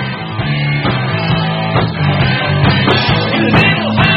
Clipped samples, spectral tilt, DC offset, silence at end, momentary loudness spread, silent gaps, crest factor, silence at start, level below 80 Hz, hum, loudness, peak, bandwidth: under 0.1%; -8 dB/octave; under 0.1%; 0 s; 5 LU; none; 12 dB; 0 s; -34 dBFS; none; -13 LUFS; 0 dBFS; 5.8 kHz